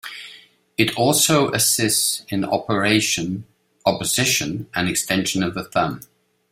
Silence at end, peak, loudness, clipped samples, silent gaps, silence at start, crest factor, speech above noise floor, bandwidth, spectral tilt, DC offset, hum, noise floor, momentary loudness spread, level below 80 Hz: 0.5 s; -2 dBFS; -19 LUFS; under 0.1%; none; 0.05 s; 20 dB; 27 dB; 16 kHz; -3 dB/octave; under 0.1%; none; -47 dBFS; 13 LU; -54 dBFS